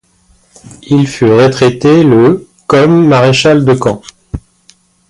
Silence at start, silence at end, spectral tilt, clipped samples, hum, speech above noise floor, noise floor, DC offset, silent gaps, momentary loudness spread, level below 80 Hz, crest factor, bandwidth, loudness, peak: 0.85 s; 0.7 s; -6.5 dB/octave; under 0.1%; none; 42 dB; -50 dBFS; under 0.1%; none; 18 LU; -38 dBFS; 10 dB; 11.5 kHz; -8 LUFS; 0 dBFS